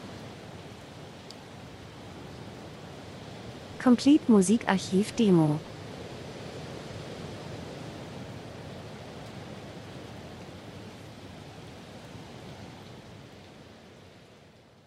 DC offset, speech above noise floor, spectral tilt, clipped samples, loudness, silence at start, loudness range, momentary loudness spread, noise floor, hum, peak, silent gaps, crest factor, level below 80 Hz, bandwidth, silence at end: under 0.1%; 33 dB; -6 dB/octave; under 0.1%; -27 LUFS; 0 s; 20 LU; 23 LU; -55 dBFS; none; -8 dBFS; none; 24 dB; -60 dBFS; 12.5 kHz; 1.85 s